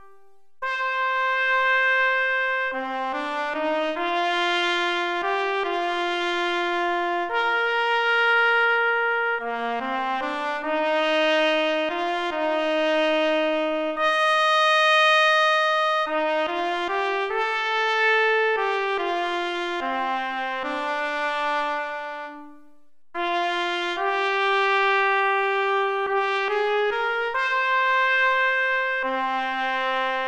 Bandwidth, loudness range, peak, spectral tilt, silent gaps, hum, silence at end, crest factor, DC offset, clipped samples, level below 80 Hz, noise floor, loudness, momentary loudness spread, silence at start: 11 kHz; 6 LU; -8 dBFS; -1.5 dB/octave; none; none; 0 s; 14 dB; 0.1%; under 0.1%; -62 dBFS; -62 dBFS; -22 LUFS; 8 LU; 0 s